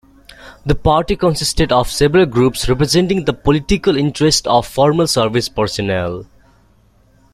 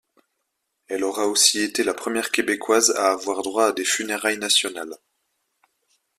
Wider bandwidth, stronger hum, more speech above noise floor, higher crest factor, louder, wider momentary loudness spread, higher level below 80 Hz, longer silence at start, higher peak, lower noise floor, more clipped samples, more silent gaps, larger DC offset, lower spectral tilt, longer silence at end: about the same, 15.5 kHz vs 15.5 kHz; neither; second, 37 dB vs 55 dB; second, 14 dB vs 22 dB; first, -15 LUFS vs -21 LUFS; second, 6 LU vs 10 LU; first, -30 dBFS vs -68 dBFS; second, 0.4 s vs 0.9 s; about the same, 0 dBFS vs -2 dBFS; second, -51 dBFS vs -77 dBFS; neither; neither; neither; first, -5 dB/octave vs -0.5 dB/octave; about the same, 1.1 s vs 1.2 s